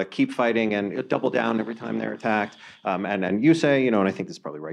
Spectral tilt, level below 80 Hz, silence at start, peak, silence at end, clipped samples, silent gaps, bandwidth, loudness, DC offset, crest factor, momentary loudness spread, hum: -6.5 dB/octave; -72 dBFS; 0 s; -6 dBFS; 0 s; under 0.1%; none; 10.5 kHz; -24 LUFS; under 0.1%; 16 dB; 12 LU; none